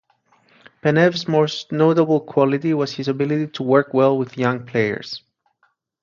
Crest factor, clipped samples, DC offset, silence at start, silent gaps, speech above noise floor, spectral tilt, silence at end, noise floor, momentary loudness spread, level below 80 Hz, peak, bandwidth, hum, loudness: 18 dB; under 0.1%; under 0.1%; 0.85 s; none; 47 dB; -7 dB/octave; 0.85 s; -65 dBFS; 7 LU; -64 dBFS; -2 dBFS; 7.4 kHz; none; -19 LUFS